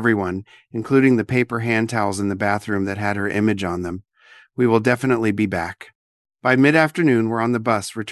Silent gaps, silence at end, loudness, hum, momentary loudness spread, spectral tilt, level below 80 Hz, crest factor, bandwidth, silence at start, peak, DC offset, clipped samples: 5.95-6.25 s; 0 s; -19 LUFS; none; 14 LU; -6.5 dB/octave; -48 dBFS; 20 dB; 12.5 kHz; 0 s; 0 dBFS; under 0.1%; under 0.1%